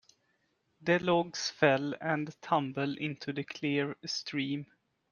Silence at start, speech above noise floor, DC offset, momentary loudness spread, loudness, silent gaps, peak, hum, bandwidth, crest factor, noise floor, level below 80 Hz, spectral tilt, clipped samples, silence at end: 0.8 s; 44 dB; under 0.1%; 9 LU; -32 LUFS; none; -8 dBFS; none; 7.2 kHz; 24 dB; -76 dBFS; -74 dBFS; -5 dB/octave; under 0.1%; 0.5 s